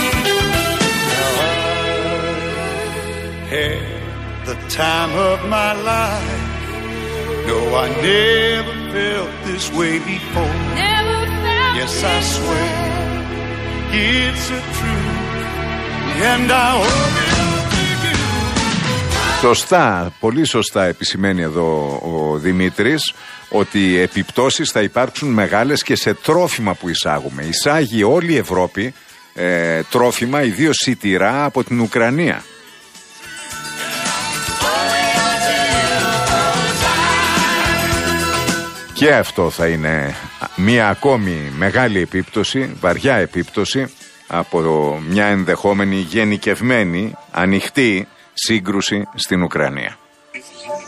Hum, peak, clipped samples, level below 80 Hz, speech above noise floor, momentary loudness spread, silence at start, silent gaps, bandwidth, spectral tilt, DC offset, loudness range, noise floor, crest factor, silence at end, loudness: none; 0 dBFS; under 0.1%; -34 dBFS; 24 dB; 9 LU; 0 s; none; 15 kHz; -4 dB/octave; under 0.1%; 4 LU; -41 dBFS; 16 dB; 0 s; -16 LUFS